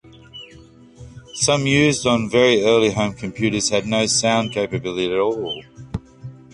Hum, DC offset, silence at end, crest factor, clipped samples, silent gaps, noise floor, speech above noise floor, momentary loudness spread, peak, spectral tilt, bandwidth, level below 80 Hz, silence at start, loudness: none; under 0.1%; 0.2 s; 18 dB; under 0.1%; none; -45 dBFS; 27 dB; 21 LU; -2 dBFS; -4 dB/octave; 11.5 kHz; -46 dBFS; 0.35 s; -18 LUFS